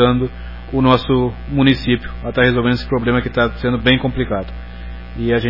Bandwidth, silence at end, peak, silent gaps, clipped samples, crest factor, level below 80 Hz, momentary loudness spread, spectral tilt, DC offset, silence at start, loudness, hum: 5.8 kHz; 0 s; 0 dBFS; none; under 0.1%; 16 dB; -30 dBFS; 16 LU; -8.5 dB/octave; 1%; 0 s; -17 LUFS; 60 Hz at -30 dBFS